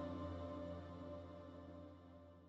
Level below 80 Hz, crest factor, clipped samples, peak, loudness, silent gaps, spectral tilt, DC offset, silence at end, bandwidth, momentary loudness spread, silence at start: -66 dBFS; 16 dB; under 0.1%; -36 dBFS; -52 LUFS; none; -8.5 dB/octave; under 0.1%; 0 s; 7.6 kHz; 11 LU; 0 s